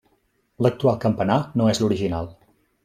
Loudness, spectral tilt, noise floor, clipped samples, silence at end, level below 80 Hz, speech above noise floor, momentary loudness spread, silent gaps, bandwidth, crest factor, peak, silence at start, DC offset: -22 LUFS; -6.5 dB/octave; -67 dBFS; under 0.1%; 0.55 s; -52 dBFS; 46 dB; 7 LU; none; 14.5 kHz; 18 dB; -4 dBFS; 0.6 s; under 0.1%